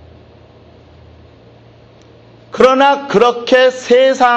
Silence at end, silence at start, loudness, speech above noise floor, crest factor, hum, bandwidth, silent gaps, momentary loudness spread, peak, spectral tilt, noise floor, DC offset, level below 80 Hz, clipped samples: 0 s; 2.55 s; -11 LUFS; 32 dB; 14 dB; none; 8.2 kHz; none; 3 LU; 0 dBFS; -4 dB/octave; -42 dBFS; under 0.1%; -50 dBFS; under 0.1%